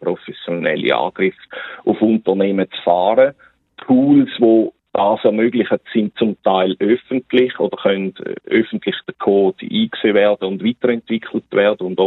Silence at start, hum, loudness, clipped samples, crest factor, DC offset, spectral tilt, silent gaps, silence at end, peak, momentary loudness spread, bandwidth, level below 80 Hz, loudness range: 0 s; none; -17 LUFS; under 0.1%; 16 dB; under 0.1%; -9 dB/octave; none; 0 s; 0 dBFS; 9 LU; 4.1 kHz; -64 dBFS; 3 LU